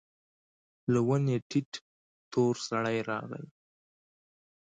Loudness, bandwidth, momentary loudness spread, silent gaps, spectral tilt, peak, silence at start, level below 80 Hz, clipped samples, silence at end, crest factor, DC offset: -31 LUFS; 9.2 kHz; 16 LU; 1.42-1.50 s, 1.66-1.72 s, 1.81-2.31 s; -6.5 dB/octave; -16 dBFS; 0.9 s; -70 dBFS; under 0.1%; 1.25 s; 18 dB; under 0.1%